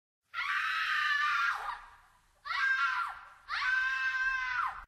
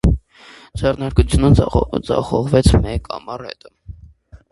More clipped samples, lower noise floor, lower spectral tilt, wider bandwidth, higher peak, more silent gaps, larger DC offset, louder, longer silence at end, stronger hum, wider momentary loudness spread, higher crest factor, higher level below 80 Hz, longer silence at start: neither; first, -64 dBFS vs -44 dBFS; second, 1.5 dB/octave vs -7 dB/octave; first, 15 kHz vs 11.5 kHz; second, -20 dBFS vs 0 dBFS; neither; neither; second, -31 LUFS vs -17 LUFS; second, 0 s vs 0.15 s; neither; second, 13 LU vs 17 LU; about the same, 14 dB vs 18 dB; second, -66 dBFS vs -24 dBFS; first, 0.35 s vs 0.05 s